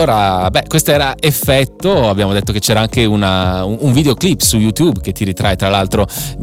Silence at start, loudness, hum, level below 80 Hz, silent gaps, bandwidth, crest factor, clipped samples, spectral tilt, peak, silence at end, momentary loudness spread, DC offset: 0 s; -13 LUFS; none; -30 dBFS; none; 17 kHz; 12 dB; under 0.1%; -4.5 dB/octave; 0 dBFS; 0 s; 4 LU; under 0.1%